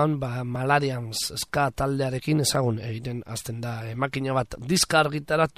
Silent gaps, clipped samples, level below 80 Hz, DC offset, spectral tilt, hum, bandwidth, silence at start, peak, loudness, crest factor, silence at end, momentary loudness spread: none; under 0.1%; -50 dBFS; 0.1%; -4.5 dB/octave; none; 15.5 kHz; 0 s; -6 dBFS; -26 LUFS; 18 dB; 0.1 s; 11 LU